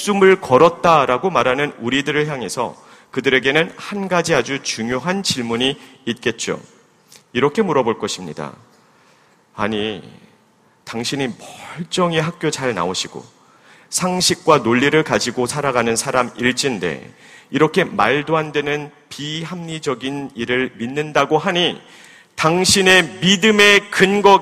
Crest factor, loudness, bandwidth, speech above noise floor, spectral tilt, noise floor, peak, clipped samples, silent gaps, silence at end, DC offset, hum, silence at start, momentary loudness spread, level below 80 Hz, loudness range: 18 dB; -17 LUFS; 15.5 kHz; 38 dB; -3.5 dB/octave; -55 dBFS; 0 dBFS; under 0.1%; none; 0 s; under 0.1%; none; 0 s; 14 LU; -54 dBFS; 7 LU